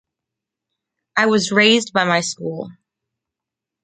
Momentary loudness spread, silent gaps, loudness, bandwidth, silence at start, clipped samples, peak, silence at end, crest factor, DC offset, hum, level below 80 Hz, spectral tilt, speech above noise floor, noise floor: 15 LU; none; -16 LUFS; 9.4 kHz; 1.15 s; under 0.1%; -2 dBFS; 1.1 s; 20 dB; under 0.1%; none; -66 dBFS; -3.5 dB/octave; 68 dB; -85 dBFS